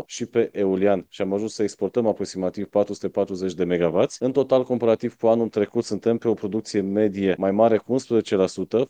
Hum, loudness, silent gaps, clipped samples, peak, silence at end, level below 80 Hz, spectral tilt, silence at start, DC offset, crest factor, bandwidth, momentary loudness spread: none; -23 LUFS; none; under 0.1%; -4 dBFS; 0.05 s; -64 dBFS; -6.5 dB/octave; 0 s; under 0.1%; 18 dB; 9.6 kHz; 6 LU